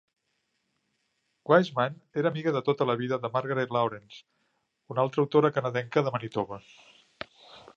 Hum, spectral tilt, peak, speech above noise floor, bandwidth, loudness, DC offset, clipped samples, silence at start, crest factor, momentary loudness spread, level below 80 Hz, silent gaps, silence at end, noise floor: none; -7.5 dB/octave; -6 dBFS; 50 dB; 7.2 kHz; -28 LUFS; under 0.1%; under 0.1%; 1.5 s; 24 dB; 20 LU; -72 dBFS; none; 0.2 s; -77 dBFS